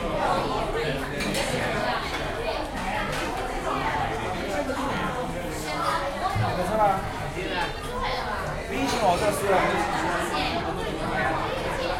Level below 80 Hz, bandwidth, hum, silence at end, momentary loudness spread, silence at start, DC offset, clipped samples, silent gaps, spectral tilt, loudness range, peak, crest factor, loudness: -40 dBFS; 16.5 kHz; none; 0 s; 7 LU; 0 s; under 0.1%; under 0.1%; none; -4.5 dB/octave; 3 LU; -10 dBFS; 16 dB; -27 LUFS